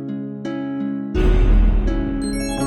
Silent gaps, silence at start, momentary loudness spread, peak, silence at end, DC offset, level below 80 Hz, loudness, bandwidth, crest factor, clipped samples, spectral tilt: none; 0 s; 10 LU; -6 dBFS; 0 s; under 0.1%; -20 dBFS; -21 LUFS; 12 kHz; 12 dB; under 0.1%; -6.5 dB/octave